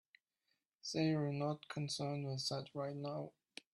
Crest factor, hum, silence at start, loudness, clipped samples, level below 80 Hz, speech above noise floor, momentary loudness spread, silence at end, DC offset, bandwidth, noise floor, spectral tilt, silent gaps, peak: 18 dB; none; 0.85 s; -41 LUFS; under 0.1%; -80 dBFS; 45 dB; 11 LU; 0.45 s; under 0.1%; 12.5 kHz; -86 dBFS; -5.5 dB/octave; none; -24 dBFS